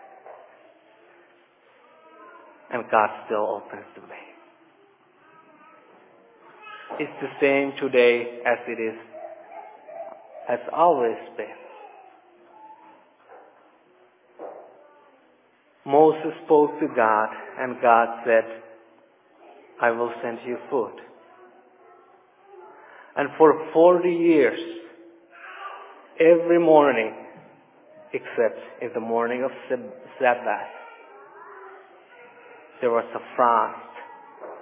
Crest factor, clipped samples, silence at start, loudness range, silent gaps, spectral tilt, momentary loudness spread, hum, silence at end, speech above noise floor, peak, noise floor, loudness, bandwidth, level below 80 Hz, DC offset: 22 dB; under 0.1%; 0.25 s; 9 LU; none; -9 dB/octave; 25 LU; none; 0 s; 39 dB; -2 dBFS; -60 dBFS; -22 LUFS; 3.9 kHz; -84 dBFS; under 0.1%